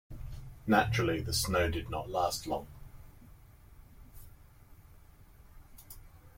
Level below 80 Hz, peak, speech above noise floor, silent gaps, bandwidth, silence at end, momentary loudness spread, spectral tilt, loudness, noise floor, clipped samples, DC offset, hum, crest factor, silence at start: -50 dBFS; -14 dBFS; 25 dB; none; 16.5 kHz; 0.05 s; 25 LU; -4.5 dB/octave; -32 LUFS; -56 dBFS; under 0.1%; under 0.1%; none; 22 dB; 0.1 s